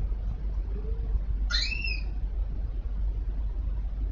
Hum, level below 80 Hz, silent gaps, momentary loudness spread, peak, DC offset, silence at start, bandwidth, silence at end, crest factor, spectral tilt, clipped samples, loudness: none; -30 dBFS; none; 7 LU; -12 dBFS; under 0.1%; 0 s; 7.4 kHz; 0 s; 18 dB; -4.5 dB/octave; under 0.1%; -33 LUFS